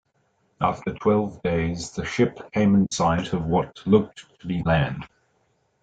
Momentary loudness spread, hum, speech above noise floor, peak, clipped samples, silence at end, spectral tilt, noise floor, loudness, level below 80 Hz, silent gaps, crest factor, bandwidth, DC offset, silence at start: 10 LU; none; 45 dB; -6 dBFS; under 0.1%; 0.75 s; -6.5 dB/octave; -68 dBFS; -23 LUFS; -48 dBFS; none; 18 dB; 9 kHz; under 0.1%; 0.6 s